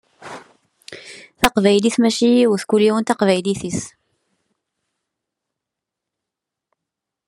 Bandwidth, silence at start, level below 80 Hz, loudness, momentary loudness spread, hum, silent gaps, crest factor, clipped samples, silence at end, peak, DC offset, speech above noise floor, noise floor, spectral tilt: 13 kHz; 0.25 s; -50 dBFS; -17 LUFS; 22 LU; none; none; 20 dB; under 0.1%; 3.4 s; 0 dBFS; under 0.1%; 68 dB; -84 dBFS; -4.5 dB/octave